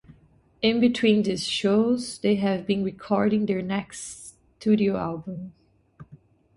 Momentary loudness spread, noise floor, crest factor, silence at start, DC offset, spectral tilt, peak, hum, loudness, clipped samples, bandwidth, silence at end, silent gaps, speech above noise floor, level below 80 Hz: 16 LU; -58 dBFS; 18 dB; 0.1 s; under 0.1%; -5.5 dB/octave; -8 dBFS; none; -24 LUFS; under 0.1%; 11.5 kHz; 0.4 s; none; 35 dB; -60 dBFS